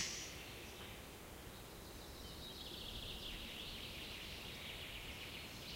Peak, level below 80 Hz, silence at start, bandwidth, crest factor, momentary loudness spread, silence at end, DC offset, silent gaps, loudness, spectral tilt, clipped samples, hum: -28 dBFS; -60 dBFS; 0 s; 16 kHz; 22 dB; 6 LU; 0 s; under 0.1%; none; -49 LUFS; -2.5 dB/octave; under 0.1%; none